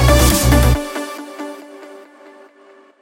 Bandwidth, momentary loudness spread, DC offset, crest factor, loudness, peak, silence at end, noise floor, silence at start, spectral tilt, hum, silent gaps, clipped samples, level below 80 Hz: 17 kHz; 24 LU; under 0.1%; 16 dB; -14 LUFS; 0 dBFS; 1 s; -47 dBFS; 0 s; -4.5 dB/octave; none; none; under 0.1%; -20 dBFS